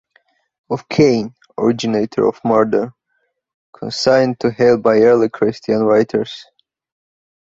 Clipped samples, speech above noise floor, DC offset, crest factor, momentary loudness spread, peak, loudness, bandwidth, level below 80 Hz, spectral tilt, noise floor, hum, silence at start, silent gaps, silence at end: under 0.1%; 53 dB; under 0.1%; 16 dB; 14 LU; -2 dBFS; -15 LUFS; 8 kHz; -54 dBFS; -6 dB/octave; -68 dBFS; none; 0.7 s; 3.54-3.73 s; 1.05 s